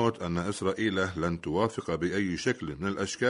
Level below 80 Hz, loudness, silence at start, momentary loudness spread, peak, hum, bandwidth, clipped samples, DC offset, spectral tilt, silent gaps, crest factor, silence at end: -54 dBFS; -30 LUFS; 0 s; 4 LU; -12 dBFS; none; 11 kHz; under 0.1%; under 0.1%; -5.5 dB/octave; none; 18 dB; 0 s